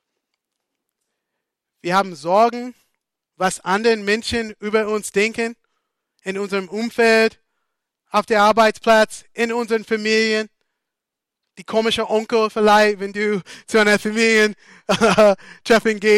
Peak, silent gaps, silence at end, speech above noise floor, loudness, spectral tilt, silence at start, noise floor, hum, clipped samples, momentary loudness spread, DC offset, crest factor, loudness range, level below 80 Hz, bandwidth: -6 dBFS; none; 0 s; 66 dB; -18 LUFS; -4 dB/octave; 1.85 s; -84 dBFS; none; under 0.1%; 11 LU; under 0.1%; 14 dB; 5 LU; -56 dBFS; 15.5 kHz